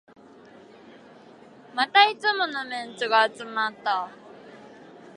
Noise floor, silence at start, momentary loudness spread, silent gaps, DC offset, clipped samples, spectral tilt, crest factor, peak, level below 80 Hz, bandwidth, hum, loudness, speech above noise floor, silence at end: -50 dBFS; 1.75 s; 14 LU; none; under 0.1%; under 0.1%; -2 dB/octave; 24 dB; -4 dBFS; -80 dBFS; 11 kHz; none; -23 LUFS; 26 dB; 0.05 s